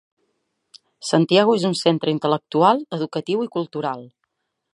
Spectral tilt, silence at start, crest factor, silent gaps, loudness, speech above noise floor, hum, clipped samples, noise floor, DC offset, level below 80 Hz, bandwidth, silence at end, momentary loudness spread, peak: -5.5 dB/octave; 1 s; 20 dB; none; -20 LUFS; 55 dB; none; under 0.1%; -75 dBFS; under 0.1%; -72 dBFS; 11.5 kHz; 0.65 s; 11 LU; -2 dBFS